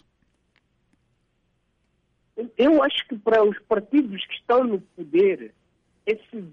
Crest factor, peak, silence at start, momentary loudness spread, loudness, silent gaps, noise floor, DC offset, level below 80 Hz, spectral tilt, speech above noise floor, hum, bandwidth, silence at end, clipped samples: 14 dB; -10 dBFS; 2.35 s; 14 LU; -22 LUFS; none; -70 dBFS; under 0.1%; -64 dBFS; -7 dB/octave; 48 dB; none; 6.2 kHz; 0.05 s; under 0.1%